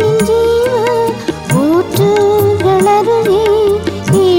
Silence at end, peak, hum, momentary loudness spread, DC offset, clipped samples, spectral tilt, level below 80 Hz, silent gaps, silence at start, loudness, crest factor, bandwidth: 0 s; -2 dBFS; none; 5 LU; 0.2%; under 0.1%; -6 dB/octave; -38 dBFS; none; 0 s; -11 LUFS; 8 dB; 17 kHz